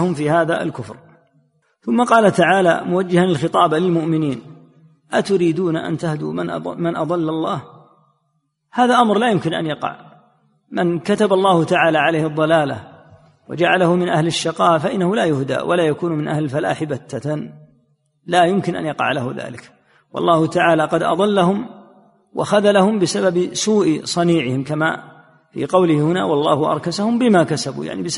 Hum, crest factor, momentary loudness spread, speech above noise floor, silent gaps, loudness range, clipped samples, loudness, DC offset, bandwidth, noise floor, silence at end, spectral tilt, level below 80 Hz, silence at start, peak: none; 16 dB; 11 LU; 52 dB; none; 4 LU; under 0.1%; -17 LUFS; under 0.1%; 11.5 kHz; -68 dBFS; 0 s; -5.5 dB/octave; -60 dBFS; 0 s; 0 dBFS